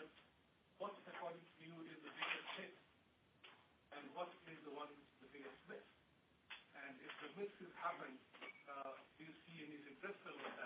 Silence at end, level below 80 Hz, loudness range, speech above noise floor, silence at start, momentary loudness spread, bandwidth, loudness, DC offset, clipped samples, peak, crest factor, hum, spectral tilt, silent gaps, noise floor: 0 s; under -90 dBFS; 5 LU; 24 dB; 0 s; 13 LU; 4.9 kHz; -53 LUFS; under 0.1%; under 0.1%; -28 dBFS; 26 dB; none; -1.5 dB/octave; none; -75 dBFS